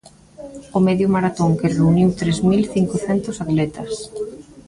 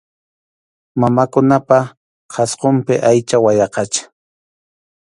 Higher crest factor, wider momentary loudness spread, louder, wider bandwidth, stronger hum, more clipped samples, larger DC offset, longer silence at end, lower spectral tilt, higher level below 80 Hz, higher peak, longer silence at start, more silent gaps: about the same, 14 dB vs 16 dB; first, 14 LU vs 9 LU; second, -19 LUFS vs -14 LUFS; about the same, 11.5 kHz vs 11.5 kHz; neither; neither; neither; second, 0.05 s vs 1 s; first, -7 dB/octave vs -5.5 dB/octave; first, -46 dBFS vs -56 dBFS; second, -4 dBFS vs 0 dBFS; second, 0.4 s vs 0.95 s; second, none vs 1.97-2.29 s